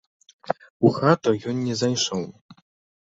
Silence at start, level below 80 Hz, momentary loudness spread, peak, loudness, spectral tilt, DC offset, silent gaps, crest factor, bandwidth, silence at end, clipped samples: 0.5 s; -60 dBFS; 11 LU; -4 dBFS; -23 LUFS; -5 dB/octave; under 0.1%; 0.70-0.80 s, 2.41-2.49 s; 20 dB; 8 kHz; 0.5 s; under 0.1%